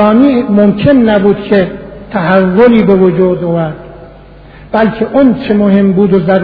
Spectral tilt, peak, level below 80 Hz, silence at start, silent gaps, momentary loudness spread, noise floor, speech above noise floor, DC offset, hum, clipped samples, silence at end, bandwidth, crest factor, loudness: -10.5 dB/octave; 0 dBFS; -36 dBFS; 0 s; none; 10 LU; -33 dBFS; 26 dB; under 0.1%; none; 0.9%; 0 s; 5 kHz; 8 dB; -9 LUFS